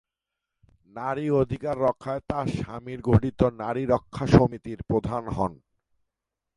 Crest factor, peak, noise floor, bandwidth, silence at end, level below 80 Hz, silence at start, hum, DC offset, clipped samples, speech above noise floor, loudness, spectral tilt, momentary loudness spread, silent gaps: 26 dB; -2 dBFS; -86 dBFS; 11 kHz; 1 s; -44 dBFS; 0.95 s; none; under 0.1%; under 0.1%; 61 dB; -26 LUFS; -8.5 dB/octave; 12 LU; none